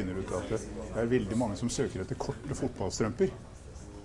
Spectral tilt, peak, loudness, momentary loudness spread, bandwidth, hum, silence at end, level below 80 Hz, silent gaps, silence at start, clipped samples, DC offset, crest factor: -5.5 dB/octave; -14 dBFS; -33 LUFS; 12 LU; 11.5 kHz; none; 0 s; -48 dBFS; none; 0 s; under 0.1%; under 0.1%; 18 dB